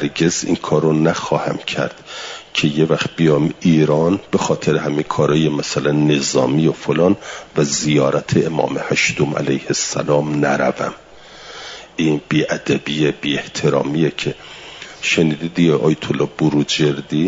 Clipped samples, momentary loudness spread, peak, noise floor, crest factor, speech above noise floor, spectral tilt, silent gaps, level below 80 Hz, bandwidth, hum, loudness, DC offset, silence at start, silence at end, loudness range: under 0.1%; 9 LU; -2 dBFS; -38 dBFS; 14 dB; 21 dB; -5 dB/octave; none; -52 dBFS; 7.8 kHz; none; -17 LUFS; under 0.1%; 0 s; 0 s; 3 LU